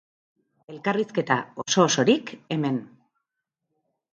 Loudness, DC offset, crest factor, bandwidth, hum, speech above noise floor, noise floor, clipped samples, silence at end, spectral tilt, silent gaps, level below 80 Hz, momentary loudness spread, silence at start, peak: -24 LUFS; under 0.1%; 22 dB; 9.6 kHz; none; 59 dB; -83 dBFS; under 0.1%; 1.25 s; -4 dB/octave; none; -72 dBFS; 11 LU; 0.7 s; -4 dBFS